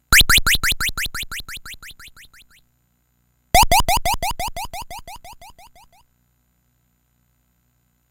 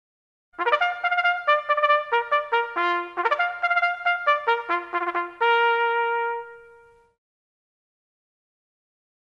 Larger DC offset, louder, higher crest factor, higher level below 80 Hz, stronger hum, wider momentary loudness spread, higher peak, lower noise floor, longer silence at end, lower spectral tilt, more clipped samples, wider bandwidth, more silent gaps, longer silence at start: neither; first, -18 LUFS vs -22 LUFS; about the same, 22 dB vs 18 dB; first, -30 dBFS vs -74 dBFS; first, 60 Hz at -65 dBFS vs none; first, 24 LU vs 6 LU; first, 0 dBFS vs -6 dBFS; first, -65 dBFS vs -53 dBFS; about the same, 2.6 s vs 2.6 s; second, -1 dB/octave vs -2.5 dB/octave; neither; first, 17 kHz vs 7.6 kHz; neither; second, 0.1 s vs 0.6 s